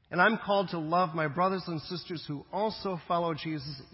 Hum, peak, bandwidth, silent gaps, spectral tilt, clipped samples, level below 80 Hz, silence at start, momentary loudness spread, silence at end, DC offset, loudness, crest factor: none; -10 dBFS; 5.8 kHz; none; -9.5 dB/octave; under 0.1%; -64 dBFS; 0.1 s; 12 LU; 0.1 s; under 0.1%; -31 LUFS; 20 dB